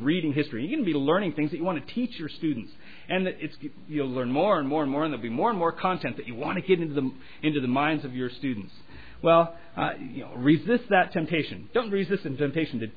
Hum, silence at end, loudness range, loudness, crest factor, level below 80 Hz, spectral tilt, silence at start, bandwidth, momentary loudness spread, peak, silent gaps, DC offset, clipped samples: none; 0.05 s; 4 LU; -27 LUFS; 18 dB; -60 dBFS; -9.5 dB/octave; 0 s; 5 kHz; 10 LU; -8 dBFS; none; 0.7%; under 0.1%